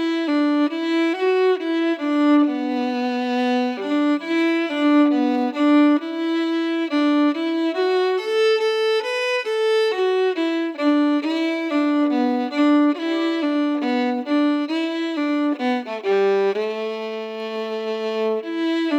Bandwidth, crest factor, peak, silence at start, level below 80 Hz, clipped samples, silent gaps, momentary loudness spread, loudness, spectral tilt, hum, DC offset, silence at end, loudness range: 9 kHz; 12 dB; -8 dBFS; 0 s; under -90 dBFS; under 0.1%; none; 6 LU; -20 LUFS; -4.5 dB/octave; none; under 0.1%; 0 s; 3 LU